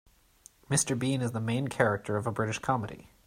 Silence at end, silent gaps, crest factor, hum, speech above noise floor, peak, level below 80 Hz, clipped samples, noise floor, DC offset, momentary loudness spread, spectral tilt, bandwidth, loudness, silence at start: 0.25 s; none; 22 dB; none; 29 dB; -10 dBFS; -62 dBFS; under 0.1%; -59 dBFS; under 0.1%; 4 LU; -4.5 dB/octave; 16 kHz; -30 LUFS; 0.7 s